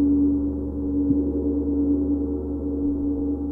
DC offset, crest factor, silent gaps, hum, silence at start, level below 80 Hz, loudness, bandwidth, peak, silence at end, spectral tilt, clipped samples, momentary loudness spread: under 0.1%; 14 dB; none; none; 0 s; -34 dBFS; -24 LUFS; 1.4 kHz; -10 dBFS; 0 s; -14 dB/octave; under 0.1%; 6 LU